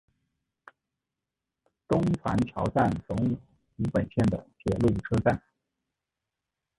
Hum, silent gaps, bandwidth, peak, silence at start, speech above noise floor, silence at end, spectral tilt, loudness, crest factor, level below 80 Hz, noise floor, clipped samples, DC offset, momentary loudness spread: none; none; 11.5 kHz; -10 dBFS; 1.9 s; 61 dB; 1.4 s; -8.5 dB/octave; -28 LUFS; 20 dB; -48 dBFS; -88 dBFS; under 0.1%; under 0.1%; 7 LU